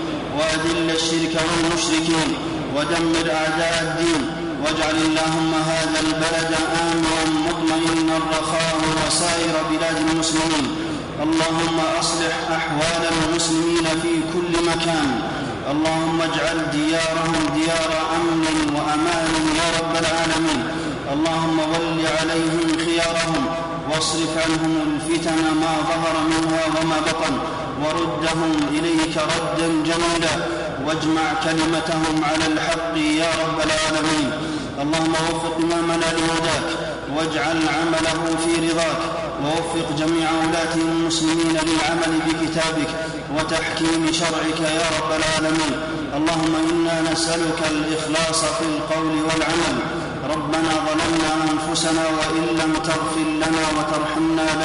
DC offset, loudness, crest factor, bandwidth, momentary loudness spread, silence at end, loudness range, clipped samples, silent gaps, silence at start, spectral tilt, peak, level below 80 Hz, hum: under 0.1%; -20 LUFS; 14 dB; 11 kHz; 4 LU; 0 s; 1 LU; under 0.1%; none; 0 s; -4 dB/octave; -8 dBFS; -44 dBFS; none